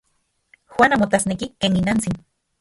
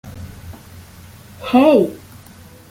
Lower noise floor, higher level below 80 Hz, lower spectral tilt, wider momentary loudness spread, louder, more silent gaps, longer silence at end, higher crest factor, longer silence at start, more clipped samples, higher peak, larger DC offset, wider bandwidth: first, -69 dBFS vs -42 dBFS; about the same, -46 dBFS vs -50 dBFS; second, -4.5 dB/octave vs -6.5 dB/octave; second, 12 LU vs 26 LU; second, -19 LUFS vs -14 LUFS; neither; second, 0.4 s vs 0.75 s; about the same, 20 dB vs 18 dB; first, 0.7 s vs 0.05 s; neither; about the same, 0 dBFS vs -2 dBFS; neither; second, 11.5 kHz vs 17 kHz